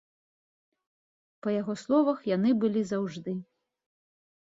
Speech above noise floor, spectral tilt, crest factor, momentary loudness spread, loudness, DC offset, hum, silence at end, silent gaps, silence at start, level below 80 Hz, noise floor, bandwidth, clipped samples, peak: over 63 dB; -7.5 dB/octave; 18 dB; 11 LU; -28 LUFS; under 0.1%; none; 1.1 s; none; 1.45 s; -74 dBFS; under -90 dBFS; 7.8 kHz; under 0.1%; -12 dBFS